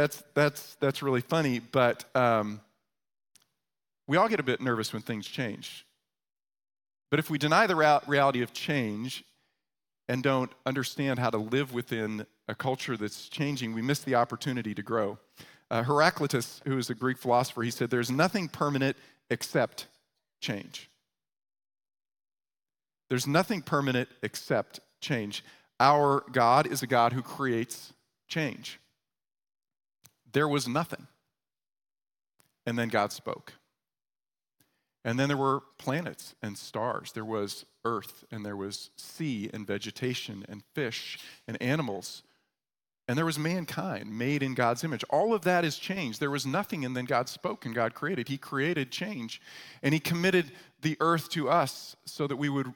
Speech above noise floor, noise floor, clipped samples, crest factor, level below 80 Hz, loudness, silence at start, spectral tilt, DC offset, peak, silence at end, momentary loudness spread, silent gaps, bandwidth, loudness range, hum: over 60 dB; under -90 dBFS; under 0.1%; 24 dB; -74 dBFS; -30 LUFS; 0 s; -5 dB/octave; under 0.1%; -8 dBFS; 0 s; 15 LU; none; 18 kHz; 8 LU; none